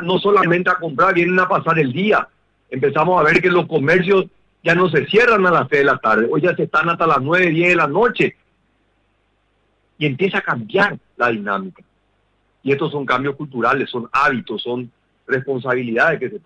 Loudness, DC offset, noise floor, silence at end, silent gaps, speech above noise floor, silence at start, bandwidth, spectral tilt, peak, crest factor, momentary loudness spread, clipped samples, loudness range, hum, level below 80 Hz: -16 LUFS; under 0.1%; -63 dBFS; 0.1 s; none; 47 dB; 0 s; 9.2 kHz; -7 dB/octave; -4 dBFS; 14 dB; 10 LU; under 0.1%; 7 LU; none; -54 dBFS